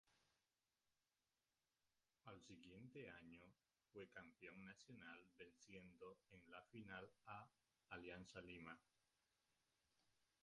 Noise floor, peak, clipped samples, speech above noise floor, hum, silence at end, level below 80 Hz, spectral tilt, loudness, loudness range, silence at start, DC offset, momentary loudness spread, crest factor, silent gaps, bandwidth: under -90 dBFS; -42 dBFS; under 0.1%; over 28 dB; none; 0.2 s; -84 dBFS; -5 dB/octave; -62 LUFS; 5 LU; 0.05 s; under 0.1%; 8 LU; 22 dB; none; 10.5 kHz